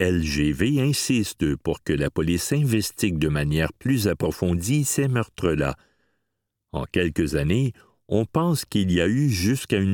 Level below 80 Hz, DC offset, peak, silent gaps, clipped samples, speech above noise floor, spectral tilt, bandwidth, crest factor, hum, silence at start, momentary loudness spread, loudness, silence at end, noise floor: -40 dBFS; under 0.1%; -6 dBFS; none; under 0.1%; 57 dB; -5.5 dB/octave; 19 kHz; 18 dB; none; 0 s; 4 LU; -23 LUFS; 0 s; -79 dBFS